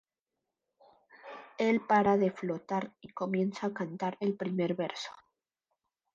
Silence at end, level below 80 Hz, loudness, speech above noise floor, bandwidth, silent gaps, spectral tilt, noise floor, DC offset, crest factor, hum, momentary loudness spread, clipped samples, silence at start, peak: 1.05 s; -74 dBFS; -32 LUFS; 57 dB; 7.6 kHz; none; -6.5 dB/octave; -88 dBFS; under 0.1%; 18 dB; none; 17 LU; under 0.1%; 1.25 s; -16 dBFS